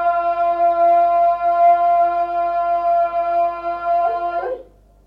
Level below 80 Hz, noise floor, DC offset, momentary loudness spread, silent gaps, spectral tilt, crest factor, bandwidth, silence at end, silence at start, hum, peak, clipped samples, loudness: -52 dBFS; -43 dBFS; under 0.1%; 9 LU; none; -6 dB/octave; 10 dB; 5.2 kHz; 0.45 s; 0 s; 50 Hz at -50 dBFS; -6 dBFS; under 0.1%; -17 LUFS